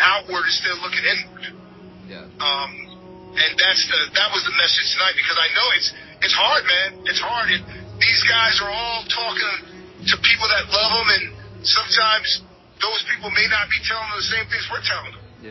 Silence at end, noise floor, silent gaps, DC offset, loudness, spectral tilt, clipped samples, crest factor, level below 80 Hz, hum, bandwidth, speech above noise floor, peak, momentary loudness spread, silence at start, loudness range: 0 s; -40 dBFS; none; under 0.1%; -18 LUFS; -1 dB/octave; under 0.1%; 20 dB; -50 dBFS; none; 6.2 kHz; 20 dB; -2 dBFS; 9 LU; 0 s; 4 LU